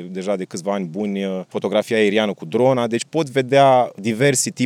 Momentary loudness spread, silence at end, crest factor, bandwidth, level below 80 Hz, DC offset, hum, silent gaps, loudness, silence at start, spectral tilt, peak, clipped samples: 10 LU; 0 s; 16 dB; 16 kHz; -84 dBFS; under 0.1%; none; none; -19 LUFS; 0 s; -4.5 dB/octave; -2 dBFS; under 0.1%